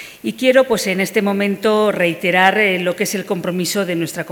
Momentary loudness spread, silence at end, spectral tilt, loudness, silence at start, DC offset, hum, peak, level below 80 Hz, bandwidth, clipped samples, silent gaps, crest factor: 8 LU; 0 s; -4 dB/octave; -16 LUFS; 0 s; under 0.1%; none; 0 dBFS; -60 dBFS; over 20 kHz; under 0.1%; none; 16 dB